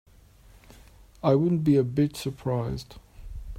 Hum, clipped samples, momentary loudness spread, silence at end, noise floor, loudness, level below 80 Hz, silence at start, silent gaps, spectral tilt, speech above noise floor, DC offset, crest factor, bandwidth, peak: none; under 0.1%; 21 LU; 0 s; -54 dBFS; -25 LUFS; -46 dBFS; 1.25 s; none; -8 dB/octave; 29 dB; under 0.1%; 20 dB; 16 kHz; -8 dBFS